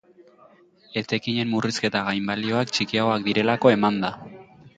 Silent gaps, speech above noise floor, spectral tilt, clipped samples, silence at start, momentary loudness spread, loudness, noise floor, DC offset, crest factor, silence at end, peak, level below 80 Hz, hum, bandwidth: none; 32 dB; -5 dB/octave; under 0.1%; 0.9 s; 12 LU; -23 LUFS; -54 dBFS; under 0.1%; 20 dB; 0.1 s; -4 dBFS; -62 dBFS; none; 9.2 kHz